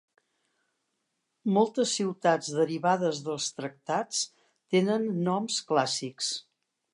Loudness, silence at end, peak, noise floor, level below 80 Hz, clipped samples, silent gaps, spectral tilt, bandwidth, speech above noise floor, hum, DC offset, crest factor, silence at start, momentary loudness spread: -28 LUFS; 0.55 s; -10 dBFS; -80 dBFS; -82 dBFS; under 0.1%; none; -4 dB/octave; 11.5 kHz; 52 dB; none; under 0.1%; 18 dB; 1.45 s; 6 LU